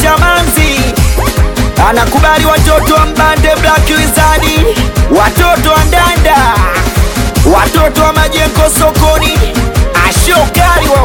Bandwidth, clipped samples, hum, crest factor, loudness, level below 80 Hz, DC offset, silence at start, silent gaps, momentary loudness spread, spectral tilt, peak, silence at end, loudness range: 19 kHz; 0.5%; none; 8 dB; -8 LUFS; -12 dBFS; under 0.1%; 0 s; none; 4 LU; -4.5 dB/octave; 0 dBFS; 0 s; 1 LU